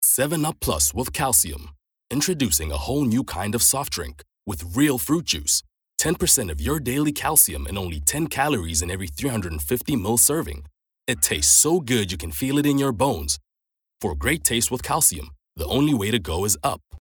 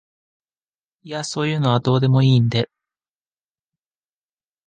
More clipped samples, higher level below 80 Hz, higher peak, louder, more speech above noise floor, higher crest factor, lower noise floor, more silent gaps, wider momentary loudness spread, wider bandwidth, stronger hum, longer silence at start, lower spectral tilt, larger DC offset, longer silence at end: neither; first, -40 dBFS vs -56 dBFS; first, 0 dBFS vs -4 dBFS; about the same, -21 LUFS vs -19 LUFS; second, 59 dB vs over 72 dB; about the same, 22 dB vs 18 dB; second, -82 dBFS vs under -90 dBFS; neither; about the same, 12 LU vs 14 LU; first, over 20 kHz vs 9.2 kHz; neither; second, 0 s vs 1.05 s; second, -3 dB/octave vs -6.5 dB/octave; neither; second, 0 s vs 2 s